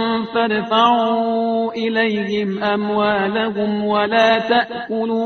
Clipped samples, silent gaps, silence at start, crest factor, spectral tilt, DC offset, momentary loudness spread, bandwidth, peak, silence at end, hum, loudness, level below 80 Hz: under 0.1%; none; 0 s; 18 dB; -2.5 dB/octave; under 0.1%; 6 LU; 6.6 kHz; 0 dBFS; 0 s; none; -18 LUFS; -58 dBFS